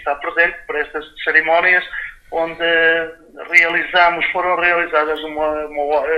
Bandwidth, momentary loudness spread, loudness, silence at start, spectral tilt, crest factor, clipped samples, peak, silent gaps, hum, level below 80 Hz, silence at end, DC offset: 13 kHz; 11 LU; -16 LUFS; 0 s; -3.5 dB/octave; 18 dB; under 0.1%; 0 dBFS; none; none; -48 dBFS; 0 s; under 0.1%